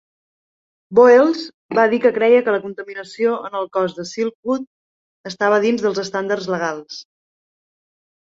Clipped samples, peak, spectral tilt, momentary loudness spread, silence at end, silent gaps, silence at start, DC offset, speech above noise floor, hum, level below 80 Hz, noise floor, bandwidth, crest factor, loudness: under 0.1%; -2 dBFS; -5 dB/octave; 18 LU; 1.35 s; 1.54-1.69 s, 4.35-4.43 s, 4.67-5.24 s; 0.9 s; under 0.1%; over 73 dB; none; -66 dBFS; under -90 dBFS; 7.8 kHz; 18 dB; -17 LUFS